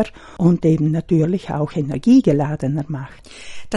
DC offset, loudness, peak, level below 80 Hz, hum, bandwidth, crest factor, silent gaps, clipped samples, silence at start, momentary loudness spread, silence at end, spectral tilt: under 0.1%; -18 LUFS; -2 dBFS; -46 dBFS; none; 11 kHz; 16 dB; none; under 0.1%; 0 s; 20 LU; 0 s; -8.5 dB/octave